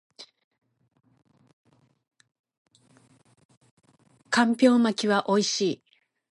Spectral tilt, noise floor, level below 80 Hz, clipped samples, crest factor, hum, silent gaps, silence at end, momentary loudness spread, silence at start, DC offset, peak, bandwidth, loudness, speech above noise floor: -4 dB/octave; -60 dBFS; -78 dBFS; under 0.1%; 22 dB; none; 0.44-0.51 s, 1.53-1.64 s, 2.39-2.44 s, 2.58-2.65 s, 3.45-3.49 s, 3.57-3.61 s, 3.71-3.77 s; 0.6 s; 8 LU; 0.2 s; under 0.1%; -6 dBFS; 11.5 kHz; -23 LUFS; 38 dB